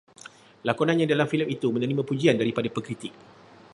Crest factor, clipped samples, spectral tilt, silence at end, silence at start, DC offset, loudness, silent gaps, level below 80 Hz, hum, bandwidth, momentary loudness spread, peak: 20 dB; under 0.1%; -6.5 dB/octave; 0.6 s; 0.25 s; under 0.1%; -25 LUFS; none; -68 dBFS; none; 11.5 kHz; 14 LU; -6 dBFS